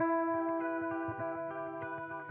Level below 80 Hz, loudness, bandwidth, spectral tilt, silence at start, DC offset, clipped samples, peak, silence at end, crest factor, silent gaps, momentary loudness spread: -78 dBFS; -36 LUFS; 3.4 kHz; -6.5 dB/octave; 0 s; under 0.1%; under 0.1%; -22 dBFS; 0 s; 14 dB; none; 8 LU